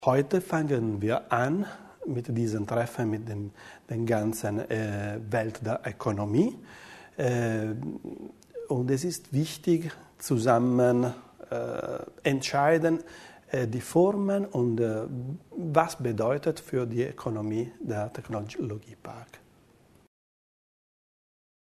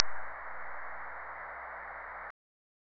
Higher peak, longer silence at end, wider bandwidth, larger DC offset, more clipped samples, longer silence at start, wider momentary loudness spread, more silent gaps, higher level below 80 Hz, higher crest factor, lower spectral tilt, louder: second, -6 dBFS vs 0 dBFS; first, 2.45 s vs 0.7 s; first, 13.5 kHz vs 6 kHz; neither; neither; about the same, 0 s vs 0 s; first, 16 LU vs 1 LU; neither; about the same, -64 dBFS vs -66 dBFS; second, 22 dB vs 36 dB; about the same, -6.5 dB/octave vs -7 dB/octave; first, -29 LUFS vs -41 LUFS